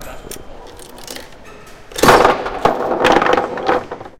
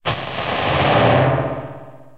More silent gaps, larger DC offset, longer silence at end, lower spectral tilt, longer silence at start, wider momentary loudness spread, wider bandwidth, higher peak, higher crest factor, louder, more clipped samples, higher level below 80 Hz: neither; second, under 0.1% vs 0.7%; about the same, 0.1 s vs 0.2 s; second, -4 dB/octave vs -8.5 dB/octave; about the same, 0 s vs 0.05 s; first, 22 LU vs 17 LU; first, 17 kHz vs 5.4 kHz; about the same, 0 dBFS vs -2 dBFS; about the same, 16 dB vs 16 dB; first, -14 LUFS vs -17 LUFS; neither; about the same, -38 dBFS vs -42 dBFS